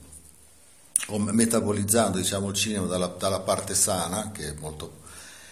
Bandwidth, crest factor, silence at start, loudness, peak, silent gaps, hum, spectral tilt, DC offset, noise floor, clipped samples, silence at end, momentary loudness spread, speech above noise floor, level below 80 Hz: 17 kHz; 26 dB; 0 s; -25 LUFS; 0 dBFS; none; none; -3.5 dB/octave; 0.1%; -55 dBFS; under 0.1%; 0 s; 17 LU; 29 dB; -54 dBFS